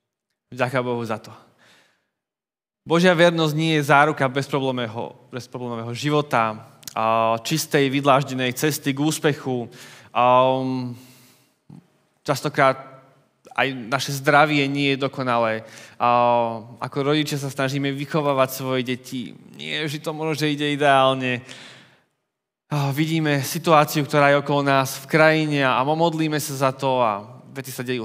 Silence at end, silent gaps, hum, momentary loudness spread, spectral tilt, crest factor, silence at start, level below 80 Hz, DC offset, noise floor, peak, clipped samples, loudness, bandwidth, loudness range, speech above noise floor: 0 s; none; none; 15 LU; -5 dB/octave; 20 dB; 0.5 s; -74 dBFS; under 0.1%; under -90 dBFS; 0 dBFS; under 0.1%; -21 LUFS; 16 kHz; 5 LU; over 69 dB